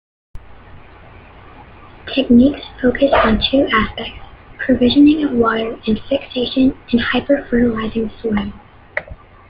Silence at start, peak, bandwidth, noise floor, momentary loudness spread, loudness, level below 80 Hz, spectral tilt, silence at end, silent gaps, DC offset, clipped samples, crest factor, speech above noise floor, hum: 0.35 s; -2 dBFS; 5.4 kHz; -40 dBFS; 15 LU; -16 LUFS; -36 dBFS; -8.5 dB/octave; 0.35 s; none; under 0.1%; under 0.1%; 16 dB; 25 dB; none